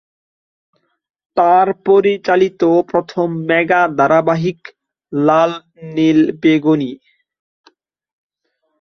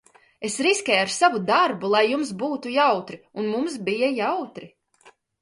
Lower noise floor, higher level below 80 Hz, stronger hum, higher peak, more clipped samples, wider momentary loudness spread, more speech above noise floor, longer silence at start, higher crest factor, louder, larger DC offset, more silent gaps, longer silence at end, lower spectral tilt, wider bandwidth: first, -69 dBFS vs -56 dBFS; first, -60 dBFS vs -72 dBFS; neither; first, 0 dBFS vs -4 dBFS; neither; about the same, 10 LU vs 11 LU; first, 56 dB vs 33 dB; first, 1.35 s vs 0.4 s; about the same, 16 dB vs 20 dB; first, -14 LUFS vs -22 LUFS; neither; neither; first, 1.85 s vs 0.3 s; first, -7 dB/octave vs -3 dB/octave; second, 6.4 kHz vs 11.5 kHz